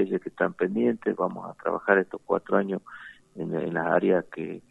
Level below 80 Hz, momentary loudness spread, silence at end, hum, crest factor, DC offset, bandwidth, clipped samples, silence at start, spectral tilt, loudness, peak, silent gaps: -70 dBFS; 13 LU; 0.1 s; none; 22 dB; under 0.1%; 7.2 kHz; under 0.1%; 0 s; -8.5 dB/octave; -27 LUFS; -4 dBFS; none